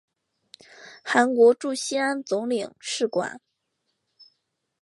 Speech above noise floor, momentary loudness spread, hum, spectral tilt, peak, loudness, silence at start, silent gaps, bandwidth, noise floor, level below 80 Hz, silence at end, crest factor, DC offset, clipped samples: 54 dB; 12 LU; none; -3 dB/octave; -6 dBFS; -23 LUFS; 0.8 s; none; 11.5 kHz; -77 dBFS; -80 dBFS; 1.45 s; 20 dB; under 0.1%; under 0.1%